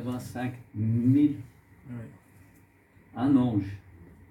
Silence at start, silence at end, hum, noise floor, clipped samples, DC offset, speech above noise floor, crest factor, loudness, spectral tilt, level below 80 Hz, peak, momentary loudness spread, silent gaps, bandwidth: 0 s; 0.25 s; none; -59 dBFS; under 0.1%; under 0.1%; 32 dB; 16 dB; -27 LUFS; -9 dB/octave; -60 dBFS; -12 dBFS; 21 LU; none; 13 kHz